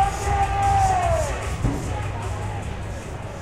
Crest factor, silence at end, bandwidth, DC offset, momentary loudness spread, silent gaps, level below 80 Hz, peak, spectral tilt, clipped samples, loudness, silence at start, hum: 14 dB; 0 s; 14 kHz; under 0.1%; 13 LU; none; -30 dBFS; -8 dBFS; -5.5 dB/octave; under 0.1%; -24 LUFS; 0 s; none